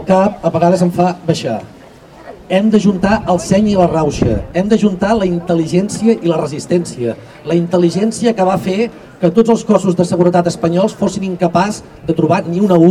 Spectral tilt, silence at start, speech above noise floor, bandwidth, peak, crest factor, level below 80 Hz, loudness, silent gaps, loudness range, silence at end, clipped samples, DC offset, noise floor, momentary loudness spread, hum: -6.5 dB/octave; 0 s; 25 dB; 12.5 kHz; 0 dBFS; 14 dB; -38 dBFS; -14 LUFS; none; 2 LU; 0 s; 0.3%; under 0.1%; -38 dBFS; 6 LU; none